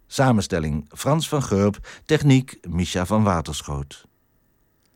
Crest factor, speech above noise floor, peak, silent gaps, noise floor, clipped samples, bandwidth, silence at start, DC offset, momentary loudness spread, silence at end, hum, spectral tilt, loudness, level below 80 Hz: 16 dB; 43 dB; -6 dBFS; none; -64 dBFS; under 0.1%; 17 kHz; 0.1 s; under 0.1%; 11 LU; 1 s; none; -6 dB/octave; -22 LUFS; -44 dBFS